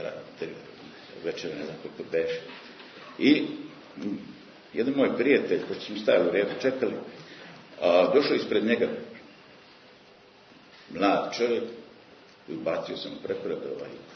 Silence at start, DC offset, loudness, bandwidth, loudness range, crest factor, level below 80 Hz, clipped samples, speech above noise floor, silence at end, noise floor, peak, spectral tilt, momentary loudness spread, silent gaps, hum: 0 s; under 0.1%; -27 LUFS; 6.6 kHz; 6 LU; 22 dB; -72 dBFS; under 0.1%; 28 dB; 0 s; -54 dBFS; -8 dBFS; -5.5 dB/octave; 22 LU; none; none